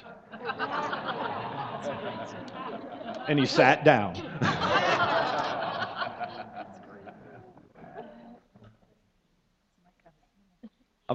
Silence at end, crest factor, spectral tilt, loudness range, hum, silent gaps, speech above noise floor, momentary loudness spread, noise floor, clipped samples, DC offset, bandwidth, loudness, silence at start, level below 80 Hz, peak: 0 s; 26 dB; -5.5 dB/octave; 16 LU; none; none; 47 dB; 25 LU; -71 dBFS; under 0.1%; under 0.1%; 8.2 kHz; -28 LUFS; 0 s; -66 dBFS; -4 dBFS